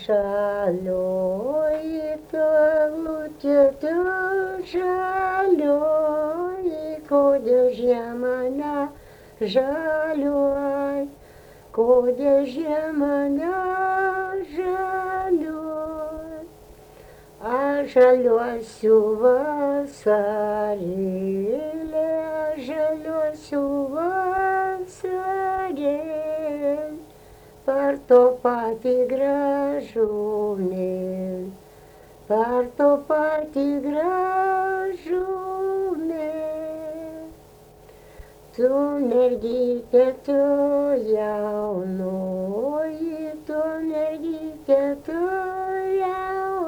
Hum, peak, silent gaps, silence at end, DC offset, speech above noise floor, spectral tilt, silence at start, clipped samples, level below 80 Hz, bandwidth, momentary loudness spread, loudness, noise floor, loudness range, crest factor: none; -6 dBFS; none; 0 s; under 0.1%; 27 dB; -7 dB/octave; 0 s; under 0.1%; -54 dBFS; over 20 kHz; 10 LU; -23 LUFS; -48 dBFS; 5 LU; 18 dB